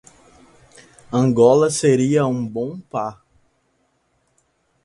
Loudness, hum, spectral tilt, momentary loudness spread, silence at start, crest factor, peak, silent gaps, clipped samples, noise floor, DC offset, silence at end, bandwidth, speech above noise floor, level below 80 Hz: -18 LUFS; none; -6 dB/octave; 13 LU; 1.1 s; 20 dB; -2 dBFS; none; under 0.1%; -66 dBFS; under 0.1%; 1.7 s; 11.5 kHz; 49 dB; -58 dBFS